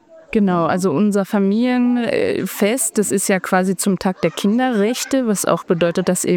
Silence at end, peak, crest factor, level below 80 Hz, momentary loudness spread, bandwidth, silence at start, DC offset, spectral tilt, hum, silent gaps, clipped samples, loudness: 0 s; -2 dBFS; 14 dB; -56 dBFS; 3 LU; 19 kHz; 0.15 s; under 0.1%; -5 dB/octave; none; none; under 0.1%; -17 LUFS